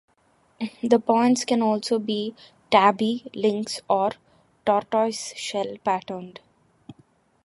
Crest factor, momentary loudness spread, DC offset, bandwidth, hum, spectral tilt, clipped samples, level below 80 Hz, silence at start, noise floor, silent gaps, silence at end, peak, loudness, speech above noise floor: 20 dB; 15 LU; under 0.1%; 11.5 kHz; none; -4.5 dB/octave; under 0.1%; -70 dBFS; 0.6 s; -63 dBFS; none; 0.55 s; -4 dBFS; -23 LUFS; 40 dB